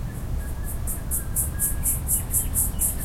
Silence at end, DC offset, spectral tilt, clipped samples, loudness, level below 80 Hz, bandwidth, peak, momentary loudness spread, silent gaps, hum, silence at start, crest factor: 0 s; under 0.1%; -3.5 dB/octave; under 0.1%; -24 LUFS; -30 dBFS; 16.5 kHz; -8 dBFS; 10 LU; none; none; 0 s; 18 dB